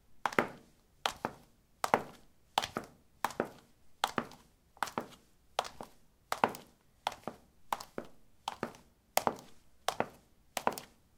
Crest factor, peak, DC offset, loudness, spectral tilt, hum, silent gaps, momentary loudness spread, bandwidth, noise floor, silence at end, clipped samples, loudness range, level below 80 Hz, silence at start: 38 dB; -2 dBFS; under 0.1%; -38 LUFS; -2.5 dB/octave; none; none; 16 LU; 18 kHz; -63 dBFS; 0.35 s; under 0.1%; 3 LU; -70 dBFS; 0.1 s